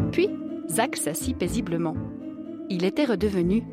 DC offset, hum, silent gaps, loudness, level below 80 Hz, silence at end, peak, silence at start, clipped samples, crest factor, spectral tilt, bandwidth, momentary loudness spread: under 0.1%; none; none; -26 LUFS; -46 dBFS; 0 s; -8 dBFS; 0 s; under 0.1%; 18 dB; -5 dB/octave; 16 kHz; 11 LU